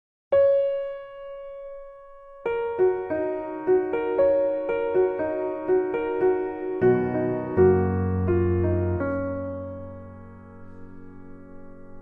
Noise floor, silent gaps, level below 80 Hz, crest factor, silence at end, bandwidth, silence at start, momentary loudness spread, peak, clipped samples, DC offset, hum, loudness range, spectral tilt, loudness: -45 dBFS; none; -50 dBFS; 18 dB; 0 s; 3.6 kHz; 0.3 s; 18 LU; -8 dBFS; under 0.1%; under 0.1%; none; 6 LU; -11.5 dB/octave; -24 LUFS